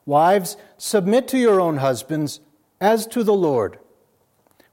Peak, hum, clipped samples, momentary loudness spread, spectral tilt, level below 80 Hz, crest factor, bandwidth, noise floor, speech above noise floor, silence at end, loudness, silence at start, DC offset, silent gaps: -4 dBFS; none; under 0.1%; 12 LU; -5.5 dB/octave; -70 dBFS; 16 dB; 16.5 kHz; -62 dBFS; 43 dB; 1 s; -19 LUFS; 0.05 s; under 0.1%; none